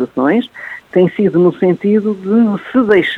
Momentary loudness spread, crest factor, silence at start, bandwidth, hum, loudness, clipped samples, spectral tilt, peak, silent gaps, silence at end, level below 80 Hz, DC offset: 6 LU; 12 dB; 0 s; 4.5 kHz; none; -13 LUFS; under 0.1%; -8.5 dB/octave; 0 dBFS; none; 0 s; -56 dBFS; under 0.1%